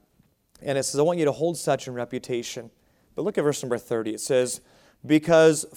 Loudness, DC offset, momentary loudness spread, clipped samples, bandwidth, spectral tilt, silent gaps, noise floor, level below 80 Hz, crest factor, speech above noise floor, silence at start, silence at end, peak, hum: -24 LUFS; under 0.1%; 15 LU; under 0.1%; 17.5 kHz; -4.5 dB/octave; none; -64 dBFS; -64 dBFS; 18 dB; 41 dB; 0.6 s; 0 s; -6 dBFS; none